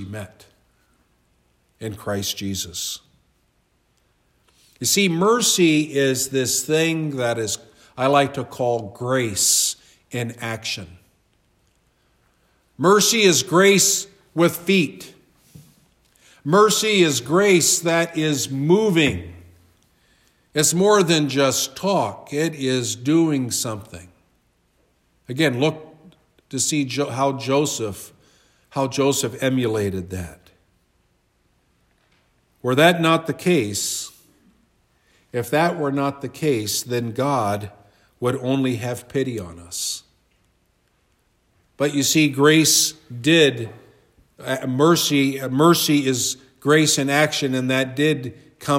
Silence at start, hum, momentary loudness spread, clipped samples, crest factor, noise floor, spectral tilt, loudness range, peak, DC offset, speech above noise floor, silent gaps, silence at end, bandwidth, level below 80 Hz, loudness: 0 s; none; 15 LU; under 0.1%; 20 dB; -65 dBFS; -3.5 dB/octave; 9 LU; -2 dBFS; under 0.1%; 45 dB; none; 0 s; 16 kHz; -62 dBFS; -19 LUFS